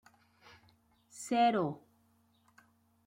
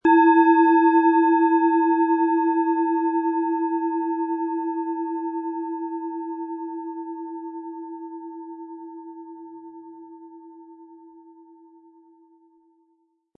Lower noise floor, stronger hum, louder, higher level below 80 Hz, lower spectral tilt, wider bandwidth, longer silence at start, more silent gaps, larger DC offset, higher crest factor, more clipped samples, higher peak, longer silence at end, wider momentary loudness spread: about the same, -71 dBFS vs -68 dBFS; neither; second, -32 LUFS vs -21 LUFS; about the same, -80 dBFS vs -76 dBFS; second, -5 dB/octave vs -7 dB/octave; first, 16 kHz vs 3.8 kHz; first, 1.15 s vs 0.05 s; neither; neither; about the same, 20 dB vs 18 dB; neither; second, -18 dBFS vs -6 dBFS; second, 1.3 s vs 2.3 s; about the same, 22 LU vs 24 LU